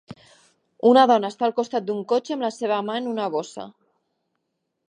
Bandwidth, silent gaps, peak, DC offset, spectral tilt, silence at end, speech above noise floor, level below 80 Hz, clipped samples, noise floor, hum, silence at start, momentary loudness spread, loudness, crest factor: 10 kHz; none; -4 dBFS; under 0.1%; -5 dB/octave; 1.2 s; 55 dB; -76 dBFS; under 0.1%; -77 dBFS; none; 0.1 s; 13 LU; -22 LUFS; 20 dB